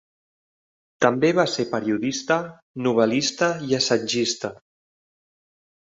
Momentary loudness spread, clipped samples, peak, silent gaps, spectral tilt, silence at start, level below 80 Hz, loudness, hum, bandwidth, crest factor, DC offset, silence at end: 6 LU; under 0.1%; -2 dBFS; 2.62-2.74 s; -4 dB/octave; 1 s; -66 dBFS; -22 LUFS; none; 8 kHz; 22 dB; under 0.1%; 1.3 s